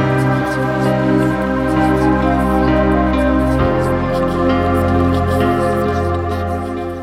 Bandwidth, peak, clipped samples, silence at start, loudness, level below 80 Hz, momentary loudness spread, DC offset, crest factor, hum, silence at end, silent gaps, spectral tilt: 15.5 kHz; -2 dBFS; under 0.1%; 0 s; -15 LUFS; -26 dBFS; 4 LU; under 0.1%; 12 dB; none; 0 s; none; -7.5 dB/octave